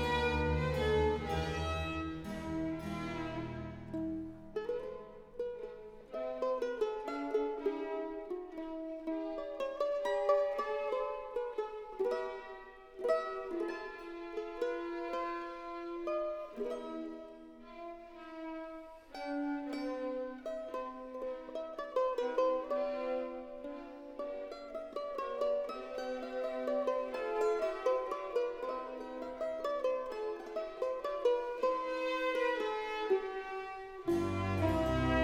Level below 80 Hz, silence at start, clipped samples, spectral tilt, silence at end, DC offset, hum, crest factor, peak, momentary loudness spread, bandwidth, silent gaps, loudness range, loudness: -52 dBFS; 0 s; under 0.1%; -6.5 dB/octave; 0 s; under 0.1%; none; 18 dB; -18 dBFS; 12 LU; 15 kHz; none; 6 LU; -37 LUFS